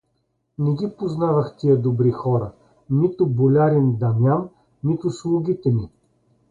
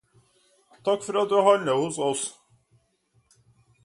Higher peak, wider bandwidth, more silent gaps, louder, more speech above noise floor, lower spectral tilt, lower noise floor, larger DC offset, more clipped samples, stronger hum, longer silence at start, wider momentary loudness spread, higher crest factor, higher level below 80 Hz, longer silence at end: about the same, -6 dBFS vs -6 dBFS; second, 7.6 kHz vs 11.5 kHz; neither; first, -21 LUFS vs -24 LUFS; first, 51 dB vs 45 dB; first, -10 dB/octave vs -4 dB/octave; about the same, -70 dBFS vs -68 dBFS; neither; neither; neither; second, 0.6 s vs 0.85 s; about the same, 9 LU vs 11 LU; second, 14 dB vs 22 dB; first, -54 dBFS vs -72 dBFS; second, 0.65 s vs 1.55 s